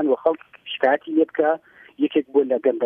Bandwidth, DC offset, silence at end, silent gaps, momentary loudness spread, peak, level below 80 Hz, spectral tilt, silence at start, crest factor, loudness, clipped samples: 3.7 kHz; under 0.1%; 0 s; none; 8 LU; -6 dBFS; -74 dBFS; -7.5 dB/octave; 0 s; 16 dB; -22 LUFS; under 0.1%